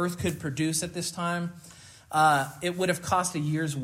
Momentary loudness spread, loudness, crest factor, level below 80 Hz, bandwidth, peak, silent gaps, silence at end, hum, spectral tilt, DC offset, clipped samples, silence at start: 10 LU; -28 LUFS; 18 dB; -62 dBFS; 16 kHz; -10 dBFS; none; 0 s; none; -4.5 dB/octave; under 0.1%; under 0.1%; 0 s